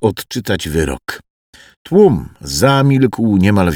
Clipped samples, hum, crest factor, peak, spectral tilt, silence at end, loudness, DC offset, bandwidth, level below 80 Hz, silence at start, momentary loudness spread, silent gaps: under 0.1%; none; 14 dB; 0 dBFS; -6 dB/octave; 0 s; -14 LUFS; under 0.1%; 19 kHz; -36 dBFS; 0 s; 12 LU; 1.30-1.53 s, 1.77-1.85 s